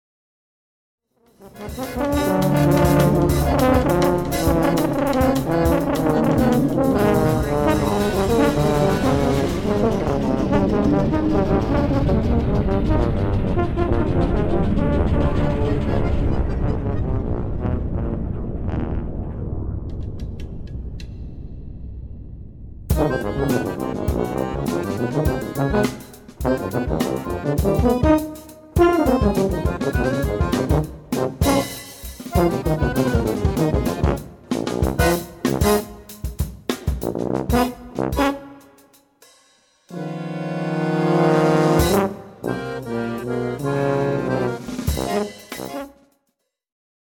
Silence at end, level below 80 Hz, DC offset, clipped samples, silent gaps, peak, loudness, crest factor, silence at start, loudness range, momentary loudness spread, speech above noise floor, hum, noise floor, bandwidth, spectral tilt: 1.1 s; -30 dBFS; under 0.1%; under 0.1%; none; -2 dBFS; -21 LUFS; 18 dB; 1.4 s; 8 LU; 14 LU; 54 dB; none; -74 dBFS; 19 kHz; -7 dB/octave